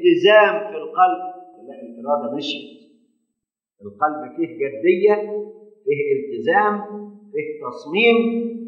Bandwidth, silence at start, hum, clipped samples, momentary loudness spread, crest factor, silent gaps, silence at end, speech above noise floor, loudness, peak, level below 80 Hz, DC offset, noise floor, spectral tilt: 7 kHz; 0 s; none; under 0.1%; 19 LU; 20 dB; none; 0 s; 62 dB; -19 LUFS; 0 dBFS; -82 dBFS; under 0.1%; -81 dBFS; -6 dB/octave